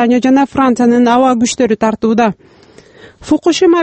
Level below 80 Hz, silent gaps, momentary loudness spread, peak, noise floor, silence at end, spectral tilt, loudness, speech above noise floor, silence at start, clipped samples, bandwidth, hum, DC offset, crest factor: -46 dBFS; none; 5 LU; 0 dBFS; -39 dBFS; 0 s; -4.5 dB/octave; -11 LUFS; 29 dB; 0 s; under 0.1%; 8.6 kHz; none; under 0.1%; 12 dB